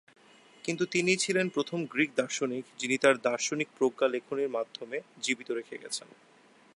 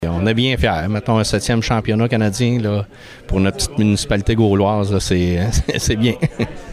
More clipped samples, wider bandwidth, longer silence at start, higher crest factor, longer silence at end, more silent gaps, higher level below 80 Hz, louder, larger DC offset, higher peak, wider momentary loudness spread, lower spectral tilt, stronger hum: neither; second, 11.5 kHz vs 15 kHz; first, 0.65 s vs 0 s; first, 22 dB vs 12 dB; first, 0.75 s vs 0 s; neither; second, -78 dBFS vs -30 dBFS; second, -30 LUFS vs -17 LUFS; neither; second, -8 dBFS vs -4 dBFS; first, 11 LU vs 5 LU; second, -3.5 dB/octave vs -5.5 dB/octave; neither